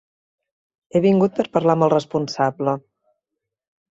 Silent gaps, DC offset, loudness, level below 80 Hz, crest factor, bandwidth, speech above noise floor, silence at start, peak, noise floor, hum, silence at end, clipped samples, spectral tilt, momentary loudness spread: none; under 0.1%; -20 LUFS; -62 dBFS; 18 dB; 7.8 kHz; 64 dB; 0.95 s; -4 dBFS; -82 dBFS; none; 1.2 s; under 0.1%; -7 dB/octave; 8 LU